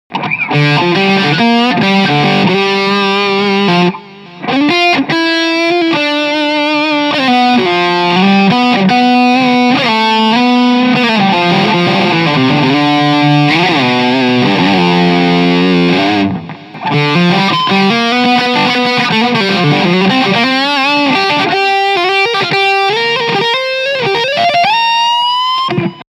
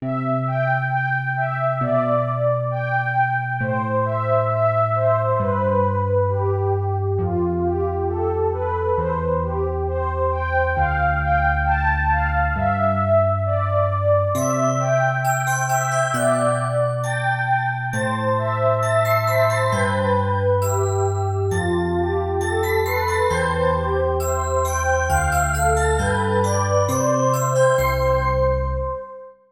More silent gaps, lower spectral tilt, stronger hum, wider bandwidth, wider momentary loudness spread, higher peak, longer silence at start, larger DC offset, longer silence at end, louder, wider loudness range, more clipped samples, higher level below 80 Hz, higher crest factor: neither; about the same, -5.5 dB/octave vs -6 dB/octave; neither; second, 13 kHz vs 17 kHz; about the same, 3 LU vs 4 LU; first, 0 dBFS vs -6 dBFS; about the same, 0.1 s vs 0 s; neither; about the same, 0.1 s vs 0.2 s; first, -10 LUFS vs -20 LUFS; about the same, 2 LU vs 2 LU; neither; second, -54 dBFS vs -32 dBFS; about the same, 10 dB vs 14 dB